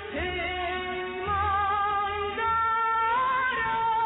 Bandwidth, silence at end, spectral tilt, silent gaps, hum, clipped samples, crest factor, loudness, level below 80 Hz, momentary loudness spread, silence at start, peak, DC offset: 4.1 kHz; 0 s; -1.5 dB/octave; none; none; under 0.1%; 10 dB; -26 LUFS; -48 dBFS; 6 LU; 0 s; -16 dBFS; under 0.1%